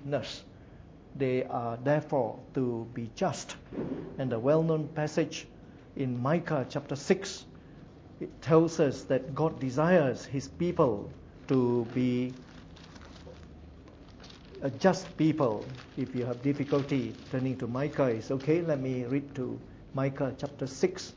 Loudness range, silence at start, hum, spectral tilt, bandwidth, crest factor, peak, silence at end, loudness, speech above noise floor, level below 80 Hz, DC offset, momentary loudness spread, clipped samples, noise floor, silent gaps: 5 LU; 0 s; none; -7 dB/octave; 8 kHz; 22 dB; -10 dBFS; 0 s; -31 LUFS; 21 dB; -58 dBFS; under 0.1%; 21 LU; under 0.1%; -51 dBFS; none